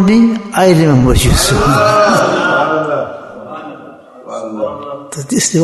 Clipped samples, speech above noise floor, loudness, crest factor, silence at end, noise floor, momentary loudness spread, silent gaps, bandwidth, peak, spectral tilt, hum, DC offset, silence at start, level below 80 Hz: under 0.1%; 25 dB; -11 LUFS; 12 dB; 0 s; -34 dBFS; 19 LU; none; 12.5 kHz; 0 dBFS; -5 dB/octave; none; under 0.1%; 0 s; -26 dBFS